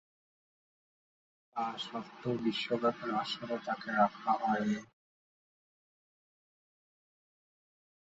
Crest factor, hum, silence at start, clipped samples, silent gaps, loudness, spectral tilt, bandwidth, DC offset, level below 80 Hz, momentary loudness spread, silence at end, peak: 22 dB; none; 1.55 s; under 0.1%; none; -34 LUFS; -3 dB/octave; 7.6 kHz; under 0.1%; -78 dBFS; 9 LU; 3.25 s; -16 dBFS